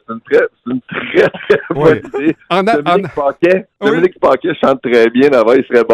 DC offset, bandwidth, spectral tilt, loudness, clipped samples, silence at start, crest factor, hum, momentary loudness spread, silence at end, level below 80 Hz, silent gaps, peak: under 0.1%; 11 kHz; -7 dB/octave; -12 LUFS; under 0.1%; 0.1 s; 12 dB; none; 7 LU; 0 s; -48 dBFS; none; 0 dBFS